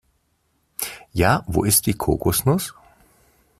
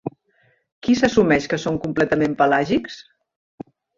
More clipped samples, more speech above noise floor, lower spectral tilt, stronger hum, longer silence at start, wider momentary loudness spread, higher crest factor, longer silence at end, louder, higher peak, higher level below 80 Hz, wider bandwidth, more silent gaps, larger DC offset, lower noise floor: neither; first, 48 dB vs 43 dB; second, -4.5 dB/octave vs -6 dB/octave; neither; first, 0.8 s vs 0.05 s; second, 12 LU vs 15 LU; about the same, 20 dB vs 18 dB; about the same, 0.85 s vs 0.95 s; about the same, -20 LUFS vs -19 LUFS; about the same, -2 dBFS vs -4 dBFS; first, -42 dBFS vs -50 dBFS; first, 16 kHz vs 7.6 kHz; second, none vs 0.72-0.82 s; neither; first, -67 dBFS vs -62 dBFS